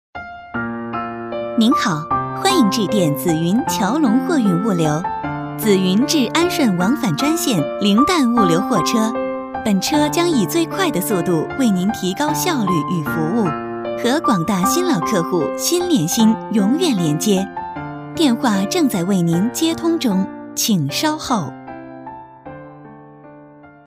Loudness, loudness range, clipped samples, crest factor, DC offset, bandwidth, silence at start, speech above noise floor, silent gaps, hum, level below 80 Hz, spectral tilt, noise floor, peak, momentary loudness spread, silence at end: -17 LUFS; 3 LU; under 0.1%; 16 dB; under 0.1%; 16 kHz; 0.15 s; 26 dB; none; none; -50 dBFS; -5 dB/octave; -42 dBFS; -2 dBFS; 10 LU; 0.15 s